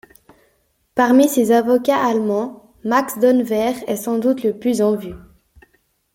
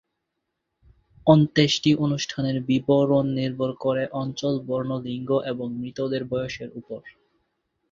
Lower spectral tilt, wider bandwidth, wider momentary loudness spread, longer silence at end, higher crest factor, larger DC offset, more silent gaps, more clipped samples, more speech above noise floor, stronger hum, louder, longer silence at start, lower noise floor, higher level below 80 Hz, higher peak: about the same, -5 dB/octave vs -6 dB/octave; first, 16.5 kHz vs 7.6 kHz; about the same, 11 LU vs 12 LU; first, 1 s vs 0.8 s; second, 16 dB vs 22 dB; neither; neither; neither; second, 47 dB vs 57 dB; neither; first, -17 LUFS vs -24 LUFS; second, 0.95 s vs 1.25 s; second, -63 dBFS vs -80 dBFS; about the same, -56 dBFS vs -58 dBFS; about the same, -2 dBFS vs -2 dBFS